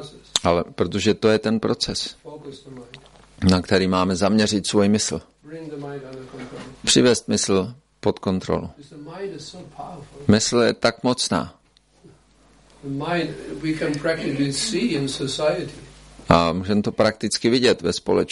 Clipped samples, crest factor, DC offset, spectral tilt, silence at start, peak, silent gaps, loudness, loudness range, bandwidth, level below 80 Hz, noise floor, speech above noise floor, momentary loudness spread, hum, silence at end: under 0.1%; 22 dB; under 0.1%; -4.5 dB/octave; 0 s; 0 dBFS; none; -21 LUFS; 4 LU; 11.5 kHz; -48 dBFS; -55 dBFS; 33 dB; 19 LU; none; 0 s